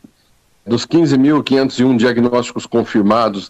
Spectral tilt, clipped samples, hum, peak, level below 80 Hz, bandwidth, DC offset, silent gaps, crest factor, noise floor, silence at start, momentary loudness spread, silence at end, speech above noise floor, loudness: -6 dB/octave; under 0.1%; none; -4 dBFS; -52 dBFS; 8.6 kHz; under 0.1%; none; 10 dB; -55 dBFS; 0.65 s; 7 LU; 0 s; 42 dB; -14 LUFS